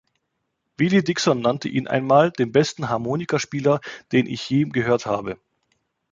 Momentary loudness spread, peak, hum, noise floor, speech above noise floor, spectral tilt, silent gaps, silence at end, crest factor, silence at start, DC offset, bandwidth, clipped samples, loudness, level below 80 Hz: 8 LU; -2 dBFS; none; -76 dBFS; 55 dB; -5.5 dB/octave; none; 0.75 s; 20 dB; 0.8 s; under 0.1%; 9.2 kHz; under 0.1%; -21 LUFS; -60 dBFS